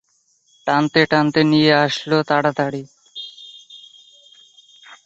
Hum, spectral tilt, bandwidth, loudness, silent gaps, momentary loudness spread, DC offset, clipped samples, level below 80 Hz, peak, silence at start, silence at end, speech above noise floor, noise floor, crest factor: none; -6 dB/octave; 8 kHz; -17 LUFS; none; 21 LU; under 0.1%; under 0.1%; -60 dBFS; -2 dBFS; 0.65 s; 0.1 s; 45 dB; -62 dBFS; 18 dB